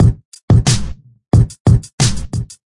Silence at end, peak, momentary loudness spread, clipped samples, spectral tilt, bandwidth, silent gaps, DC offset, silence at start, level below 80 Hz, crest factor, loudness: 0.15 s; -2 dBFS; 12 LU; under 0.1%; -5.5 dB/octave; 11.5 kHz; 0.25-0.32 s, 0.43-0.48 s, 1.60-1.65 s, 1.93-1.98 s; under 0.1%; 0 s; -24 dBFS; 12 dB; -15 LUFS